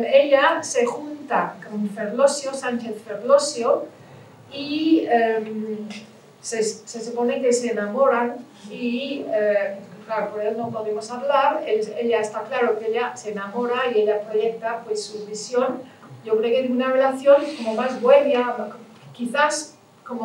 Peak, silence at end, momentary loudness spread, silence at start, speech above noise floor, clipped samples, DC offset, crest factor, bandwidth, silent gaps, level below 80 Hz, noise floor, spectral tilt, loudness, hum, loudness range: -4 dBFS; 0 s; 14 LU; 0 s; 24 dB; under 0.1%; under 0.1%; 18 dB; 12 kHz; none; -86 dBFS; -45 dBFS; -3.5 dB/octave; -22 LUFS; none; 4 LU